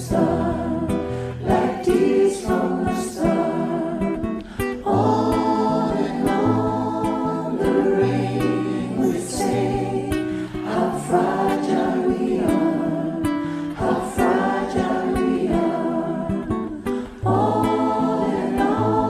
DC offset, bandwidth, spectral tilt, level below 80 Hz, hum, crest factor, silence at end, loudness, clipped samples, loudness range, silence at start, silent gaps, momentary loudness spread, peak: under 0.1%; 14.5 kHz; -7 dB/octave; -42 dBFS; none; 16 dB; 0 s; -21 LUFS; under 0.1%; 1 LU; 0 s; none; 6 LU; -6 dBFS